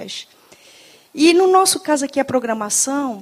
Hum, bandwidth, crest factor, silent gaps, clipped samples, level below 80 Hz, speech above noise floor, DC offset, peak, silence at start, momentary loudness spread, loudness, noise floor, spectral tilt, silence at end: none; 16 kHz; 16 dB; none; under 0.1%; -66 dBFS; 30 dB; under 0.1%; -2 dBFS; 0 s; 16 LU; -16 LUFS; -47 dBFS; -2 dB/octave; 0 s